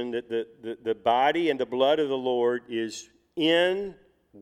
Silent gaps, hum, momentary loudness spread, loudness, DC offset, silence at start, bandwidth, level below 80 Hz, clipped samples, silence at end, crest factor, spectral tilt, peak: none; none; 13 LU; -26 LUFS; under 0.1%; 0 s; 13 kHz; -68 dBFS; under 0.1%; 0 s; 16 dB; -4.5 dB/octave; -10 dBFS